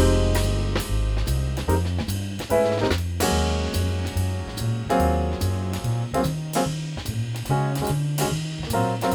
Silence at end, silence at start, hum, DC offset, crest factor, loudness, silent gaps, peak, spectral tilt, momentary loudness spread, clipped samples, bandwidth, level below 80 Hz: 0 s; 0 s; none; under 0.1%; 16 dB; -24 LUFS; none; -8 dBFS; -5.5 dB/octave; 6 LU; under 0.1%; over 20 kHz; -30 dBFS